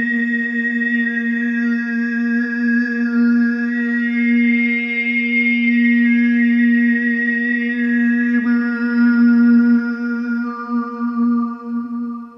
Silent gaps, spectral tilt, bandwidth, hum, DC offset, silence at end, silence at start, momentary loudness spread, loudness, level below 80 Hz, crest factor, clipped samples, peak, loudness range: none; -7 dB/octave; 5.8 kHz; none; under 0.1%; 0 s; 0 s; 8 LU; -16 LUFS; -72 dBFS; 12 dB; under 0.1%; -6 dBFS; 3 LU